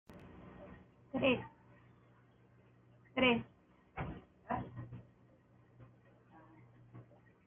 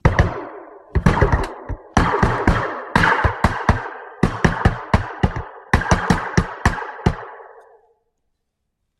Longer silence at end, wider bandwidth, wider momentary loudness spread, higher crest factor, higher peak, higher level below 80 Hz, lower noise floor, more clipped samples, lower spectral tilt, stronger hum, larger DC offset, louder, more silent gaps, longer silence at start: second, 0.45 s vs 1.5 s; second, 3.7 kHz vs 12.5 kHz; first, 27 LU vs 14 LU; about the same, 24 dB vs 20 dB; second, -18 dBFS vs 0 dBFS; second, -66 dBFS vs -28 dBFS; second, -66 dBFS vs -74 dBFS; neither; second, -3.5 dB/octave vs -6 dB/octave; neither; neither; second, -37 LUFS vs -19 LUFS; neither; about the same, 0.1 s vs 0.05 s